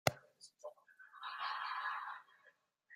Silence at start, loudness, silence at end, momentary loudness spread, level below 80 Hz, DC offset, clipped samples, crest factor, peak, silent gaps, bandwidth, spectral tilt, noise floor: 0.05 s; -44 LUFS; 0 s; 20 LU; -80 dBFS; under 0.1%; under 0.1%; 34 dB; -12 dBFS; none; 15.5 kHz; -3 dB/octave; -72 dBFS